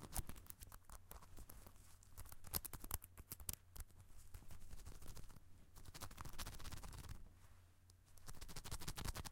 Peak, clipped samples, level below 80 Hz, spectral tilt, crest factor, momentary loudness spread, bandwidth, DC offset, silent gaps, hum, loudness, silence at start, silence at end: -20 dBFS; under 0.1%; -56 dBFS; -3 dB/octave; 32 dB; 17 LU; 17 kHz; under 0.1%; none; none; -54 LUFS; 0 s; 0 s